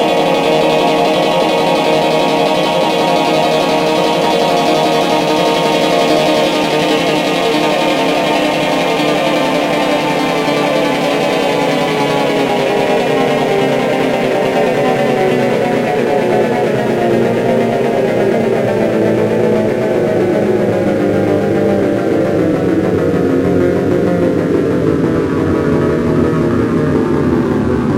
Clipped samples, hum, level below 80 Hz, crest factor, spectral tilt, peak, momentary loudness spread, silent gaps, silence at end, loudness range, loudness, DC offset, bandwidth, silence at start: under 0.1%; none; -42 dBFS; 12 dB; -5.5 dB/octave; 0 dBFS; 2 LU; none; 0 s; 1 LU; -13 LUFS; under 0.1%; 16 kHz; 0 s